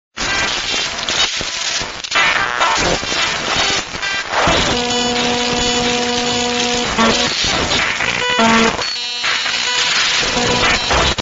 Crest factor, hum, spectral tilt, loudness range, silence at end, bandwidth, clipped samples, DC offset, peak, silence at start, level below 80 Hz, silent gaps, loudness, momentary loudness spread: 16 dB; none; -2 dB/octave; 1 LU; 0 s; 8 kHz; under 0.1%; under 0.1%; 0 dBFS; 0.15 s; -34 dBFS; none; -15 LUFS; 5 LU